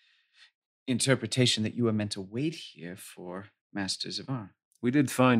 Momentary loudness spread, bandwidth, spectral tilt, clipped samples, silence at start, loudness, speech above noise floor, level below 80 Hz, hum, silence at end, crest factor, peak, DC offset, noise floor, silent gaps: 17 LU; 16 kHz; -4.5 dB/octave; under 0.1%; 0.85 s; -29 LUFS; 33 dB; -74 dBFS; none; 0 s; 22 dB; -8 dBFS; under 0.1%; -62 dBFS; 3.61-3.70 s, 4.65-4.71 s